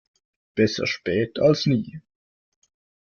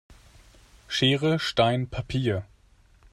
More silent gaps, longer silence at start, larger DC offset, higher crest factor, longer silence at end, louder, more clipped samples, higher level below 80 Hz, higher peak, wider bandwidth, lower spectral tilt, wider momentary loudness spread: neither; first, 0.55 s vs 0.1 s; neither; about the same, 18 dB vs 20 dB; first, 1.05 s vs 0.7 s; about the same, -23 LUFS vs -25 LUFS; neither; second, -58 dBFS vs -50 dBFS; about the same, -6 dBFS vs -8 dBFS; second, 7.2 kHz vs 12.5 kHz; about the same, -6 dB/octave vs -5.5 dB/octave; about the same, 9 LU vs 8 LU